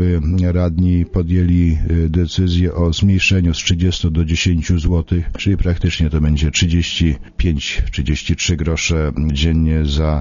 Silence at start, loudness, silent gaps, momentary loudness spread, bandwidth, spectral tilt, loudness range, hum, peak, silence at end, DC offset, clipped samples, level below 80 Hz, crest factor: 0 s; -16 LUFS; none; 4 LU; 7.4 kHz; -5.5 dB/octave; 2 LU; none; -2 dBFS; 0 s; under 0.1%; under 0.1%; -22 dBFS; 14 dB